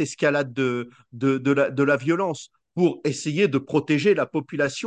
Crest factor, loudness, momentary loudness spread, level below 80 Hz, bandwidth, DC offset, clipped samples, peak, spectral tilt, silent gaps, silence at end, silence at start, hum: 16 dB; -23 LUFS; 7 LU; -66 dBFS; 10 kHz; under 0.1%; under 0.1%; -6 dBFS; -6 dB/octave; none; 0 s; 0 s; none